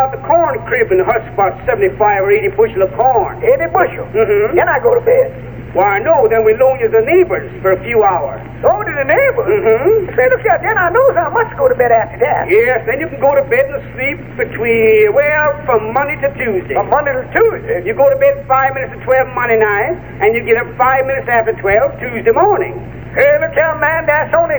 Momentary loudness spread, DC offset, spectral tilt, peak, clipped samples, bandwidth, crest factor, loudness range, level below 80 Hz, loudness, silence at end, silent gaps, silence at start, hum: 6 LU; 0.6%; -9.5 dB/octave; 0 dBFS; under 0.1%; over 20 kHz; 12 dB; 2 LU; -38 dBFS; -12 LUFS; 0 s; none; 0 s; none